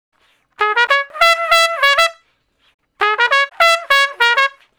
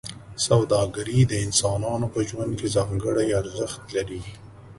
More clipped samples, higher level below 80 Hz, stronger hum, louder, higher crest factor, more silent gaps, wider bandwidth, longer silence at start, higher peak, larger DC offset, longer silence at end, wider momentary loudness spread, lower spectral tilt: first, 0.6% vs under 0.1%; second, -56 dBFS vs -46 dBFS; neither; first, -13 LUFS vs -24 LUFS; about the same, 16 dB vs 18 dB; first, 2.74-2.79 s vs none; first, over 20 kHz vs 11.5 kHz; first, 0.6 s vs 0.05 s; first, 0 dBFS vs -6 dBFS; neither; first, 0.3 s vs 0.05 s; second, 6 LU vs 11 LU; second, 2 dB/octave vs -5 dB/octave